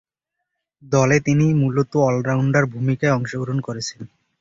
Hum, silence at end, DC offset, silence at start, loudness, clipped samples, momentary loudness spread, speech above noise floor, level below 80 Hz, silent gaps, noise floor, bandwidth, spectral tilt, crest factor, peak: none; 0.35 s; under 0.1%; 0.85 s; -19 LUFS; under 0.1%; 10 LU; 62 dB; -52 dBFS; none; -80 dBFS; 7.8 kHz; -6.5 dB/octave; 16 dB; -4 dBFS